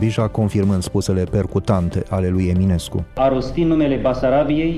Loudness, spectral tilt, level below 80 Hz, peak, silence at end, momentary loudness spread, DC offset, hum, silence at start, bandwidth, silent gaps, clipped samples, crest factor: -19 LUFS; -7.5 dB/octave; -34 dBFS; -4 dBFS; 0 s; 3 LU; under 0.1%; none; 0 s; 13.5 kHz; none; under 0.1%; 12 dB